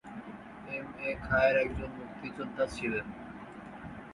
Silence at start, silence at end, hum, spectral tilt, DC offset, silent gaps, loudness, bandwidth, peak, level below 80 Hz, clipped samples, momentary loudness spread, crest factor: 0.05 s; 0 s; none; -6 dB/octave; under 0.1%; none; -33 LUFS; 11.5 kHz; -14 dBFS; -52 dBFS; under 0.1%; 19 LU; 22 dB